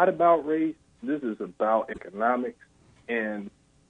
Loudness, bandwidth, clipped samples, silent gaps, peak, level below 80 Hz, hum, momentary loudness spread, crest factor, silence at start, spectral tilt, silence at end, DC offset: -27 LUFS; 8.6 kHz; under 0.1%; none; -8 dBFS; -66 dBFS; none; 16 LU; 20 dB; 0 s; -7.5 dB/octave; 0.4 s; under 0.1%